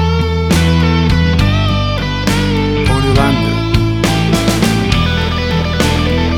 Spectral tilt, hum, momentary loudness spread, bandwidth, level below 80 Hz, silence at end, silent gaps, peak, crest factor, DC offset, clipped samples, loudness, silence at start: -5.5 dB/octave; none; 3 LU; 17.5 kHz; -20 dBFS; 0 s; none; 0 dBFS; 12 dB; under 0.1%; under 0.1%; -13 LUFS; 0 s